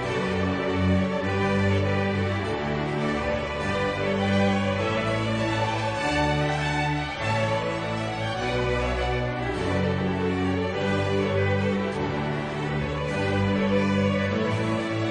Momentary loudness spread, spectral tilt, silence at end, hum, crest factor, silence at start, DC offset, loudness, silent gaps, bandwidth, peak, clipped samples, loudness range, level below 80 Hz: 4 LU; -6.5 dB/octave; 0 s; none; 14 dB; 0 s; under 0.1%; -25 LUFS; none; 10 kHz; -12 dBFS; under 0.1%; 2 LU; -42 dBFS